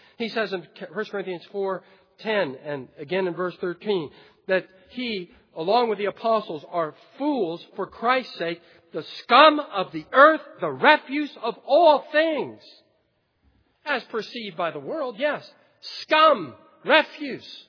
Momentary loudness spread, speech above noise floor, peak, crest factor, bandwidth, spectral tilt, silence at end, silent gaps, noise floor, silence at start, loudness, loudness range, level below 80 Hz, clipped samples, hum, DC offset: 18 LU; 46 dB; 0 dBFS; 24 dB; 5.4 kHz; -5.5 dB/octave; 0.1 s; none; -70 dBFS; 0.2 s; -23 LUFS; 10 LU; -74 dBFS; under 0.1%; none; under 0.1%